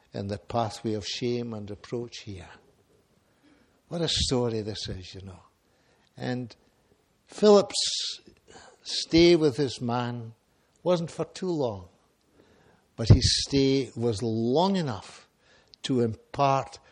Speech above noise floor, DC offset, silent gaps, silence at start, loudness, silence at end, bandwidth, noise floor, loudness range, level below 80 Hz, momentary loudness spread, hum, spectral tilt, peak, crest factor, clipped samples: 40 dB; under 0.1%; none; 0.15 s; -26 LUFS; 0.15 s; 11 kHz; -66 dBFS; 9 LU; -46 dBFS; 20 LU; none; -5 dB/octave; -4 dBFS; 24 dB; under 0.1%